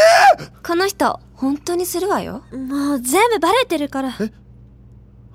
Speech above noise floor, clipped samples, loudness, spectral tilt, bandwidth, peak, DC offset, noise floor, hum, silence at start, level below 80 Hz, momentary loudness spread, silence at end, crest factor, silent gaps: 25 dB; under 0.1%; -18 LUFS; -3 dB/octave; 16.5 kHz; -2 dBFS; under 0.1%; -44 dBFS; none; 0 s; -48 dBFS; 12 LU; 1.05 s; 16 dB; none